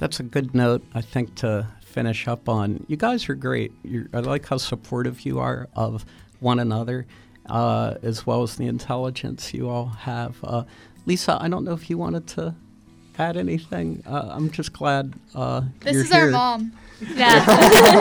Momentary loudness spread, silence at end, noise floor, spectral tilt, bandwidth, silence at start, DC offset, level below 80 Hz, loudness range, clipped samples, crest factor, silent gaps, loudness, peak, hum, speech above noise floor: 15 LU; 0 s; -50 dBFS; -5 dB/octave; over 20 kHz; 0 s; under 0.1%; -48 dBFS; 6 LU; under 0.1%; 22 dB; none; -22 LUFS; 0 dBFS; none; 29 dB